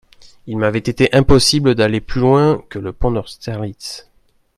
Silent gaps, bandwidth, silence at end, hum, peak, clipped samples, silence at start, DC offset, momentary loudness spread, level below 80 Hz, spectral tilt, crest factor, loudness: none; 13.5 kHz; 0.55 s; none; 0 dBFS; under 0.1%; 0.45 s; under 0.1%; 16 LU; -30 dBFS; -5.5 dB/octave; 16 dB; -15 LUFS